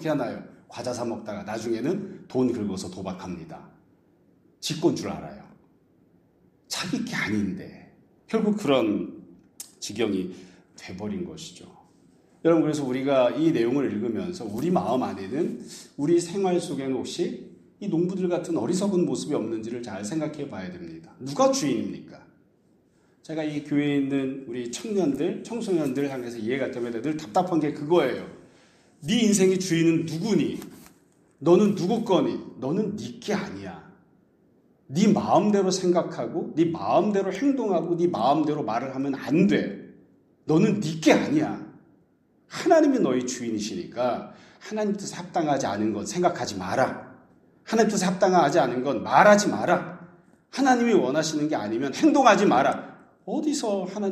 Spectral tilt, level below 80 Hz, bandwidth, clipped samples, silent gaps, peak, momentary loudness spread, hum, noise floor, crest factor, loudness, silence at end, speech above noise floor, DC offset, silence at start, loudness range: -5.5 dB/octave; -66 dBFS; 13.5 kHz; under 0.1%; none; -2 dBFS; 16 LU; none; -63 dBFS; 22 dB; -25 LUFS; 0 s; 39 dB; under 0.1%; 0 s; 8 LU